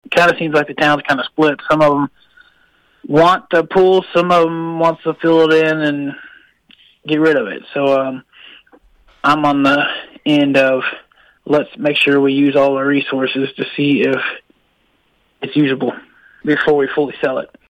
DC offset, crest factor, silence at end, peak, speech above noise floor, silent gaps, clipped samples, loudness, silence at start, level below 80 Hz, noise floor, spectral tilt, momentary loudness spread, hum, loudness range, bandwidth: under 0.1%; 14 dB; 0.25 s; -2 dBFS; 45 dB; none; under 0.1%; -15 LUFS; 0.1 s; -54 dBFS; -60 dBFS; -6 dB/octave; 11 LU; none; 5 LU; 11 kHz